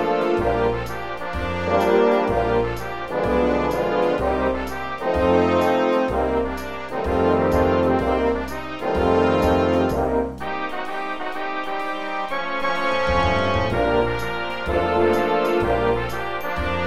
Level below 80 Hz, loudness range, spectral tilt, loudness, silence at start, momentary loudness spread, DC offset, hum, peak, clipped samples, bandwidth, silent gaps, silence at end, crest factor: -36 dBFS; 3 LU; -6.5 dB/octave; -21 LUFS; 0 s; 9 LU; 1%; none; -6 dBFS; under 0.1%; 15 kHz; none; 0 s; 14 dB